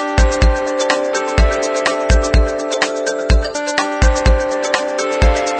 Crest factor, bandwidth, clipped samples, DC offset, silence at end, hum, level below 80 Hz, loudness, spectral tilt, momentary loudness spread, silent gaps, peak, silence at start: 14 dB; 9.4 kHz; under 0.1%; under 0.1%; 0 s; none; -18 dBFS; -16 LUFS; -4.5 dB/octave; 4 LU; none; 0 dBFS; 0 s